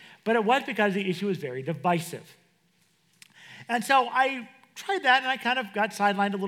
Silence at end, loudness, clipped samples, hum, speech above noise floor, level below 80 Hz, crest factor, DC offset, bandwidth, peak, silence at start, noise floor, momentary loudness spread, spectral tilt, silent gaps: 0 s; -26 LUFS; under 0.1%; none; 41 dB; under -90 dBFS; 20 dB; under 0.1%; 16.5 kHz; -6 dBFS; 0 s; -67 dBFS; 15 LU; -4.5 dB/octave; none